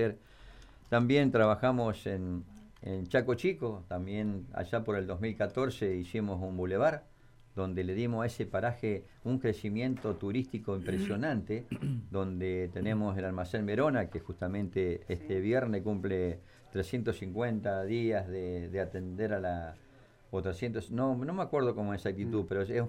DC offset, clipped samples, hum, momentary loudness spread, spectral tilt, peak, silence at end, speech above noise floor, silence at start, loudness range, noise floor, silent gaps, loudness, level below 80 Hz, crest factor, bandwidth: under 0.1%; under 0.1%; none; 8 LU; -8 dB/octave; -14 dBFS; 0 s; 20 dB; 0 s; 4 LU; -53 dBFS; none; -34 LUFS; -56 dBFS; 18 dB; 14.5 kHz